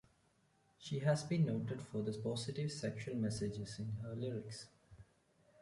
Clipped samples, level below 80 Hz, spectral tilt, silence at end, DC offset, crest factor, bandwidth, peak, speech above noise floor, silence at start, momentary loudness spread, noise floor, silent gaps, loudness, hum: under 0.1%; -68 dBFS; -6.5 dB/octave; 0.6 s; under 0.1%; 18 dB; 11.5 kHz; -24 dBFS; 35 dB; 0.8 s; 10 LU; -75 dBFS; none; -41 LUFS; none